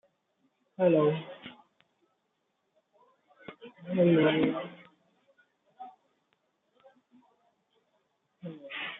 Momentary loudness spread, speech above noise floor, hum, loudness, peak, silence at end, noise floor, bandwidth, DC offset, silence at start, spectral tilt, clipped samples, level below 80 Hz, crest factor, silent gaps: 26 LU; 53 dB; none; -27 LUFS; -12 dBFS; 0 s; -79 dBFS; 4 kHz; under 0.1%; 0.8 s; -5.5 dB/octave; under 0.1%; -78 dBFS; 22 dB; none